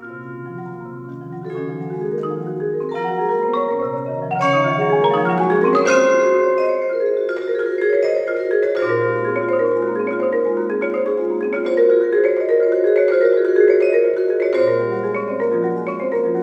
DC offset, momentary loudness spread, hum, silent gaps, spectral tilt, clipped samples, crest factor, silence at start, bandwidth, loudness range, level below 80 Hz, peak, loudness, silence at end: under 0.1%; 12 LU; none; none; -6.5 dB/octave; under 0.1%; 16 dB; 0 s; 8 kHz; 7 LU; -66 dBFS; -2 dBFS; -18 LUFS; 0 s